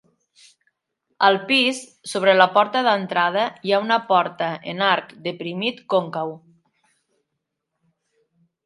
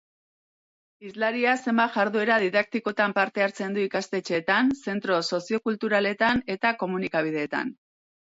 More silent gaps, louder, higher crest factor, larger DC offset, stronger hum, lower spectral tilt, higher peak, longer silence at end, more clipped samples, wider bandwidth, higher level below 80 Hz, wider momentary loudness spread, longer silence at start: neither; first, -20 LUFS vs -25 LUFS; about the same, 22 dB vs 18 dB; neither; neither; about the same, -4 dB/octave vs -5 dB/octave; first, 0 dBFS vs -8 dBFS; first, 2.3 s vs 0.65 s; neither; first, 11.5 kHz vs 8 kHz; second, -76 dBFS vs -64 dBFS; first, 13 LU vs 6 LU; first, 1.2 s vs 1 s